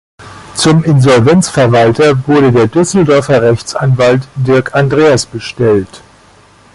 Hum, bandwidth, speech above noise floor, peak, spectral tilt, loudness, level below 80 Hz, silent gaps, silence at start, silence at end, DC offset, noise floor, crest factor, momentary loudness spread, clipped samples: none; 11.5 kHz; 34 dB; 0 dBFS; -6 dB/octave; -9 LUFS; -40 dBFS; none; 0.2 s; 0.75 s; under 0.1%; -42 dBFS; 10 dB; 6 LU; under 0.1%